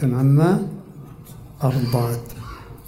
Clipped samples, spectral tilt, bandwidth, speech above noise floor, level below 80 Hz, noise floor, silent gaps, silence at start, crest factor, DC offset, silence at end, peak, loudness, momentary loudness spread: under 0.1%; -8 dB/octave; 16 kHz; 22 dB; -46 dBFS; -40 dBFS; none; 0 s; 16 dB; under 0.1%; 0 s; -6 dBFS; -20 LUFS; 24 LU